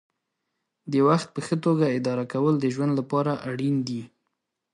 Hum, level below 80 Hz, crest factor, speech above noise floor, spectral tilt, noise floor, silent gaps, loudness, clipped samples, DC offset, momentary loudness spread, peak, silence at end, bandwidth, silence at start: none; -70 dBFS; 18 dB; 56 dB; -7.5 dB/octave; -80 dBFS; none; -25 LUFS; under 0.1%; under 0.1%; 7 LU; -8 dBFS; 0.7 s; 11 kHz; 0.85 s